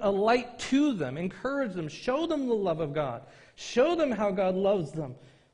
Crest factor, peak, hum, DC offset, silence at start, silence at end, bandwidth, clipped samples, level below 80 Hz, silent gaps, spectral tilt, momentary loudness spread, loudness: 16 dB; -12 dBFS; none; under 0.1%; 0 s; 0.3 s; 10.5 kHz; under 0.1%; -60 dBFS; none; -6 dB/octave; 10 LU; -29 LUFS